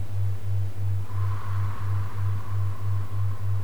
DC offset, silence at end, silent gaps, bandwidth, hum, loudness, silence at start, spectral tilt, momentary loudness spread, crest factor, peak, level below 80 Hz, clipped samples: 5%; 0 s; none; 6 kHz; none; -30 LUFS; 0 s; -7.5 dB/octave; 1 LU; 8 dB; -16 dBFS; -48 dBFS; under 0.1%